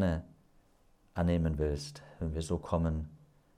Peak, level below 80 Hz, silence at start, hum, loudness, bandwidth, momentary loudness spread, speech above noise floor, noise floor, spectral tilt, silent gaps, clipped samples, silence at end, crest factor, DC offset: -16 dBFS; -46 dBFS; 0 s; none; -34 LUFS; 11.5 kHz; 12 LU; 33 dB; -66 dBFS; -7 dB/octave; none; under 0.1%; 0.4 s; 18 dB; under 0.1%